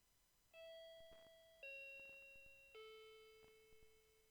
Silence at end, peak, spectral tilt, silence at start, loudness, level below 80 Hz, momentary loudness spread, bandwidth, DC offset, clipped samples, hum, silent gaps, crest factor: 0 s; -48 dBFS; -1.5 dB/octave; 0 s; -60 LUFS; -82 dBFS; 13 LU; over 20 kHz; under 0.1%; under 0.1%; none; none; 14 dB